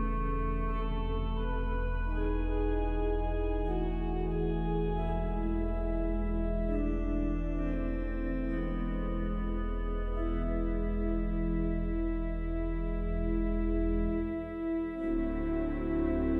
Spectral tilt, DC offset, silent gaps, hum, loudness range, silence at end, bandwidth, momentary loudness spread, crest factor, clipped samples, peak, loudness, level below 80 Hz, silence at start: -10 dB/octave; under 0.1%; none; none; 1 LU; 0 s; 3.8 kHz; 3 LU; 12 dB; under 0.1%; -18 dBFS; -34 LUFS; -34 dBFS; 0 s